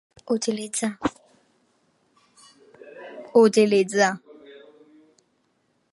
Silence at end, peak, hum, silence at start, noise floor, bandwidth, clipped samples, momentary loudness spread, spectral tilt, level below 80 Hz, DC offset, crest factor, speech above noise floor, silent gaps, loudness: 1.75 s; -4 dBFS; none; 0.3 s; -69 dBFS; 11.5 kHz; under 0.1%; 22 LU; -4 dB/octave; -62 dBFS; under 0.1%; 20 dB; 49 dB; none; -22 LUFS